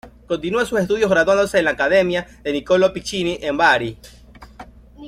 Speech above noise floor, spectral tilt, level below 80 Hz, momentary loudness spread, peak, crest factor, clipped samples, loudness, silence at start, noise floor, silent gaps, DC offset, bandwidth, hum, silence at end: 23 dB; -4.5 dB/octave; -46 dBFS; 10 LU; -2 dBFS; 18 dB; under 0.1%; -18 LUFS; 0.05 s; -41 dBFS; none; under 0.1%; 15 kHz; none; 0 s